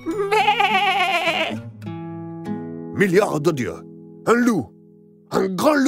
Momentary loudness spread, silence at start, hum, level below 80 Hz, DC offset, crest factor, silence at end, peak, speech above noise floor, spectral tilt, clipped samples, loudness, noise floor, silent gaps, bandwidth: 15 LU; 0 s; none; -60 dBFS; under 0.1%; 18 dB; 0 s; -4 dBFS; 31 dB; -5 dB/octave; under 0.1%; -20 LUFS; -49 dBFS; none; 16 kHz